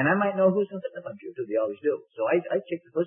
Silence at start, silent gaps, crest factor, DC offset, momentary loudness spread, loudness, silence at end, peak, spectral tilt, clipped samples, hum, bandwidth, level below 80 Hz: 0 s; none; 16 dB; under 0.1%; 14 LU; -27 LUFS; 0 s; -10 dBFS; -11 dB/octave; under 0.1%; none; 3.6 kHz; -78 dBFS